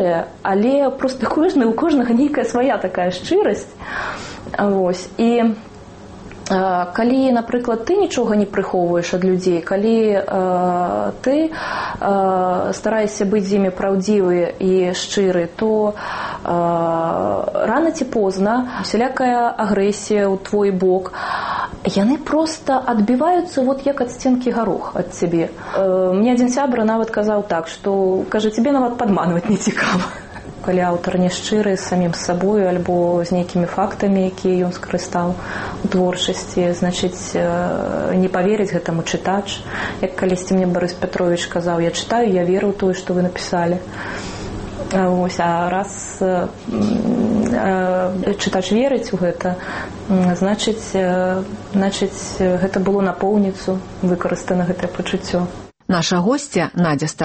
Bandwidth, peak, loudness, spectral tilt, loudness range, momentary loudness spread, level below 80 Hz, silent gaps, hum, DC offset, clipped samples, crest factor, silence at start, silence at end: 8.8 kHz; -4 dBFS; -18 LUFS; -5.5 dB/octave; 2 LU; 7 LU; -44 dBFS; none; none; under 0.1%; under 0.1%; 14 dB; 0 s; 0 s